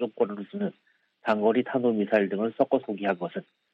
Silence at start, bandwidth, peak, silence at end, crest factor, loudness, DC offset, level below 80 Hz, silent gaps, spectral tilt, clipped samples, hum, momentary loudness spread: 0 s; 5.8 kHz; -8 dBFS; 0.3 s; 20 dB; -27 LUFS; under 0.1%; -76 dBFS; none; -8.5 dB/octave; under 0.1%; none; 10 LU